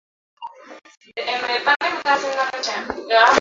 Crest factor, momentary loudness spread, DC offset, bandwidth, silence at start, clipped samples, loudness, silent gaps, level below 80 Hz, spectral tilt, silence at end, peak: 18 dB; 22 LU; under 0.1%; 7.8 kHz; 0.4 s; under 0.1%; -20 LUFS; 0.97-1.01 s, 1.76-1.80 s; -58 dBFS; -1 dB/octave; 0 s; -2 dBFS